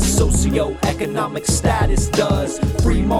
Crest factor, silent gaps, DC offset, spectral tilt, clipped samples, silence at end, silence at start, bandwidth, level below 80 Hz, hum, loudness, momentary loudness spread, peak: 14 dB; none; under 0.1%; -5 dB/octave; under 0.1%; 0 s; 0 s; 16 kHz; -22 dBFS; none; -18 LUFS; 5 LU; -2 dBFS